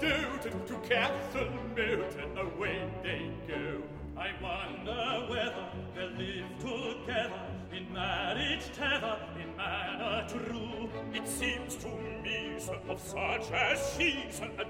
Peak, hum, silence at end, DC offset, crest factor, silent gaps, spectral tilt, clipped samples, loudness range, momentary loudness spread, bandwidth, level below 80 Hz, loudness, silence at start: -14 dBFS; none; 0 s; under 0.1%; 20 dB; none; -4 dB/octave; under 0.1%; 3 LU; 9 LU; 16 kHz; -52 dBFS; -35 LUFS; 0 s